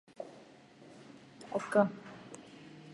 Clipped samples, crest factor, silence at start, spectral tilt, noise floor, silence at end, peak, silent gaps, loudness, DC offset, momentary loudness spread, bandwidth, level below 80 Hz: under 0.1%; 26 dB; 0.2 s; -6.5 dB/octave; -57 dBFS; 0 s; -12 dBFS; none; -33 LUFS; under 0.1%; 26 LU; 11.5 kHz; -80 dBFS